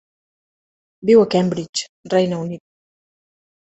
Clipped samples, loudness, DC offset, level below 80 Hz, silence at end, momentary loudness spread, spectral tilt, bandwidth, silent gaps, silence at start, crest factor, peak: under 0.1%; -18 LUFS; under 0.1%; -62 dBFS; 1.2 s; 14 LU; -5.5 dB/octave; 8.4 kHz; 1.69-1.73 s, 1.89-2.03 s; 1.05 s; 20 dB; -2 dBFS